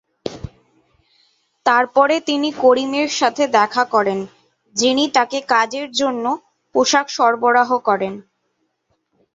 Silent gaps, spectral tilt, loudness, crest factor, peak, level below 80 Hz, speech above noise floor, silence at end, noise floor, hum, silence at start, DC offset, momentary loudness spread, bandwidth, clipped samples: none; -2.5 dB/octave; -17 LUFS; 16 dB; -2 dBFS; -54 dBFS; 53 dB; 1.15 s; -69 dBFS; none; 0.25 s; under 0.1%; 12 LU; 8 kHz; under 0.1%